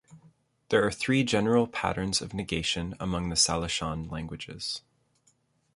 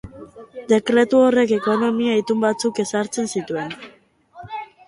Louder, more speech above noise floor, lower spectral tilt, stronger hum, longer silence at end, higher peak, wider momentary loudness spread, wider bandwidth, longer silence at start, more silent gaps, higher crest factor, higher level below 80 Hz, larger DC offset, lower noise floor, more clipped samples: second, -28 LUFS vs -19 LUFS; first, 41 dB vs 25 dB; about the same, -3.5 dB/octave vs -4.5 dB/octave; neither; first, 0.95 s vs 0.2 s; second, -10 dBFS vs -4 dBFS; second, 11 LU vs 19 LU; about the same, 11.5 kHz vs 11.5 kHz; about the same, 0.1 s vs 0.05 s; neither; about the same, 20 dB vs 16 dB; first, -48 dBFS vs -58 dBFS; neither; first, -69 dBFS vs -44 dBFS; neither